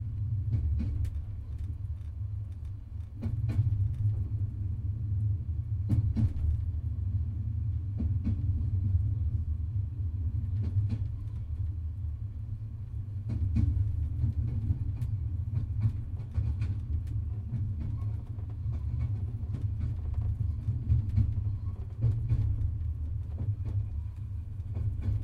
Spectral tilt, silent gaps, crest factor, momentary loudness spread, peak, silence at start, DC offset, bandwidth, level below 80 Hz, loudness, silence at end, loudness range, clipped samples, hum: -10.5 dB/octave; none; 16 dB; 9 LU; -14 dBFS; 0 s; under 0.1%; 2.7 kHz; -36 dBFS; -33 LUFS; 0 s; 3 LU; under 0.1%; none